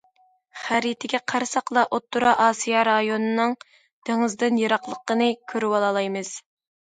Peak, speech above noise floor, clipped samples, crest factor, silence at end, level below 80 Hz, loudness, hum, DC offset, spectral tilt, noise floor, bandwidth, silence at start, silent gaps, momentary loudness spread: -4 dBFS; 40 dB; under 0.1%; 18 dB; 0.45 s; -70 dBFS; -23 LUFS; none; under 0.1%; -3.5 dB/octave; -62 dBFS; 9.4 kHz; 0.55 s; 3.93-4.02 s; 9 LU